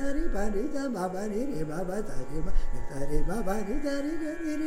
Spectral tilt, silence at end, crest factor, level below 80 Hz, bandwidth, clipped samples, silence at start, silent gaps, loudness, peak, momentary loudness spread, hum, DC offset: -6.5 dB/octave; 0 s; 14 dB; -32 dBFS; 10.5 kHz; under 0.1%; 0 s; none; -33 LUFS; -12 dBFS; 5 LU; none; under 0.1%